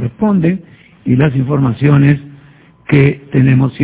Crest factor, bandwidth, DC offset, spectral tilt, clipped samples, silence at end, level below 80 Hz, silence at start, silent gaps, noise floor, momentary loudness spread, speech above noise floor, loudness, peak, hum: 12 dB; 4 kHz; under 0.1%; -12.5 dB/octave; 0.3%; 0 s; -40 dBFS; 0 s; none; -43 dBFS; 8 LU; 32 dB; -12 LUFS; 0 dBFS; none